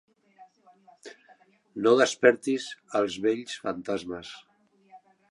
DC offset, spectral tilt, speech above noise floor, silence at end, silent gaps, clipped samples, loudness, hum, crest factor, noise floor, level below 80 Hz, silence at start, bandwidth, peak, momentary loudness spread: under 0.1%; -4 dB/octave; 34 dB; 0.35 s; none; under 0.1%; -26 LUFS; none; 24 dB; -60 dBFS; -70 dBFS; 0.4 s; 11.5 kHz; -6 dBFS; 25 LU